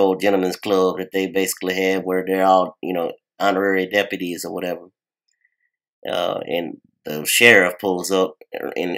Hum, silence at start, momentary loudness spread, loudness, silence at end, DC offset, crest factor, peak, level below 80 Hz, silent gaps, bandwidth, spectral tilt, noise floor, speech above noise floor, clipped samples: none; 0 s; 15 LU; -19 LUFS; 0 s; under 0.1%; 20 dB; 0 dBFS; -70 dBFS; 5.88-6.02 s; 16 kHz; -3.5 dB/octave; -68 dBFS; 49 dB; under 0.1%